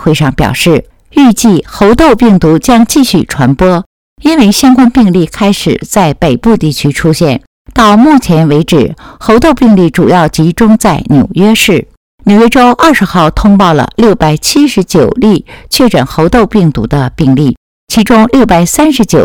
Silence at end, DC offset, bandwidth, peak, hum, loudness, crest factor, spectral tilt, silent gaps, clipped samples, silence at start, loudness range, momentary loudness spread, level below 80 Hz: 0 s; 0.7%; 18 kHz; 0 dBFS; none; -7 LUFS; 6 dB; -5.5 dB/octave; 3.86-4.16 s, 7.47-7.65 s, 11.97-12.18 s, 17.57-17.87 s; 5%; 0 s; 2 LU; 6 LU; -26 dBFS